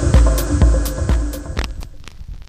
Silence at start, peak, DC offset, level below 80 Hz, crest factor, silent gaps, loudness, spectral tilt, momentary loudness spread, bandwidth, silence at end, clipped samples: 0 s; 0 dBFS; under 0.1%; -18 dBFS; 16 dB; none; -18 LUFS; -6 dB/octave; 22 LU; 15.5 kHz; 0.05 s; under 0.1%